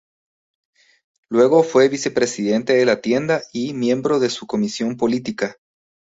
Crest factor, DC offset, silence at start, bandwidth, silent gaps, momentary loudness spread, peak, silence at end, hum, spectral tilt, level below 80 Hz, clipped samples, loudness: 16 dB; under 0.1%; 1.3 s; 8 kHz; none; 9 LU; -2 dBFS; 0.6 s; none; -5 dB/octave; -62 dBFS; under 0.1%; -19 LUFS